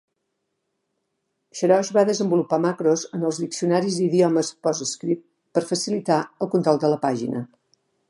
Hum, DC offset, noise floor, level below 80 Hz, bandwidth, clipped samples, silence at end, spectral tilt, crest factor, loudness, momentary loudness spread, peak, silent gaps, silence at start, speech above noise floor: none; under 0.1%; -77 dBFS; -74 dBFS; 11.5 kHz; under 0.1%; 0.65 s; -5.5 dB/octave; 18 dB; -22 LUFS; 8 LU; -4 dBFS; none; 1.55 s; 55 dB